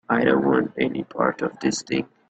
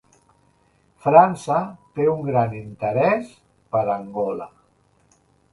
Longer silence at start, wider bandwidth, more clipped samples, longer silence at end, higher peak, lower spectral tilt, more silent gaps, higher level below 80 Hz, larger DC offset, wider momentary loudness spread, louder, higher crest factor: second, 0.1 s vs 1.05 s; second, 9 kHz vs 11.5 kHz; neither; second, 0.25 s vs 1.05 s; second, -4 dBFS vs 0 dBFS; second, -5 dB/octave vs -7.5 dB/octave; neither; about the same, -60 dBFS vs -60 dBFS; neither; second, 7 LU vs 15 LU; about the same, -23 LUFS vs -21 LUFS; about the same, 20 dB vs 22 dB